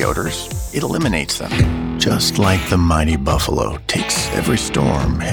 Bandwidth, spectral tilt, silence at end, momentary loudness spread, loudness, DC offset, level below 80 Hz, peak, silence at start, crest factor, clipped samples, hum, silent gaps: over 20 kHz; -4.5 dB/octave; 0 s; 6 LU; -17 LUFS; under 0.1%; -26 dBFS; -2 dBFS; 0 s; 14 dB; under 0.1%; none; none